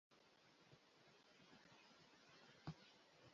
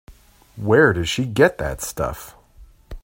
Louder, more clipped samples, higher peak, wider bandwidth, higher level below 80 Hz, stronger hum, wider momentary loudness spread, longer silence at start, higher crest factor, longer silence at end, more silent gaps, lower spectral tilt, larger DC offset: second, -64 LUFS vs -19 LUFS; neither; second, -42 dBFS vs 0 dBFS; second, 7.2 kHz vs 16.5 kHz; second, -84 dBFS vs -40 dBFS; neither; second, 10 LU vs 13 LU; about the same, 0.1 s vs 0.1 s; first, 26 dB vs 20 dB; about the same, 0 s vs 0.05 s; neither; about the same, -4.5 dB/octave vs -5 dB/octave; neither